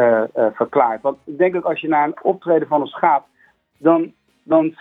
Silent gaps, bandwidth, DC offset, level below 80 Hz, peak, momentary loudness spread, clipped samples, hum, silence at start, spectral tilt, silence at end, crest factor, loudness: none; 3.9 kHz; under 0.1%; -66 dBFS; 0 dBFS; 5 LU; under 0.1%; none; 0 s; -9 dB/octave; 0.1 s; 18 dB; -18 LUFS